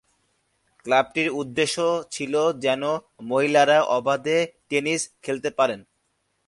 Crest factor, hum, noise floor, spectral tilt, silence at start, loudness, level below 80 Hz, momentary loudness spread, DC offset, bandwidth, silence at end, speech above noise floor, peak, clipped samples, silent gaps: 20 dB; none; -72 dBFS; -3.5 dB/octave; 0.85 s; -23 LUFS; -68 dBFS; 9 LU; under 0.1%; 11.5 kHz; 0.65 s; 49 dB; -4 dBFS; under 0.1%; none